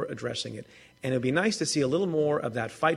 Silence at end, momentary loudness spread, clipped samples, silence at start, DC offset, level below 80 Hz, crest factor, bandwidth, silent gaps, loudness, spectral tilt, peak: 0 s; 10 LU; under 0.1%; 0 s; under 0.1%; -64 dBFS; 18 dB; 13 kHz; none; -28 LUFS; -4.5 dB/octave; -10 dBFS